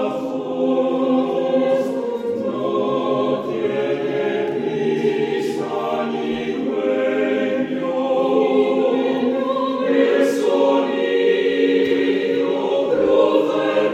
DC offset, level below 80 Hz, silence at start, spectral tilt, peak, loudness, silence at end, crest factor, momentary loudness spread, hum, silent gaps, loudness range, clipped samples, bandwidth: under 0.1%; -62 dBFS; 0 s; -6 dB/octave; -4 dBFS; -19 LUFS; 0 s; 16 dB; 6 LU; none; none; 4 LU; under 0.1%; 13 kHz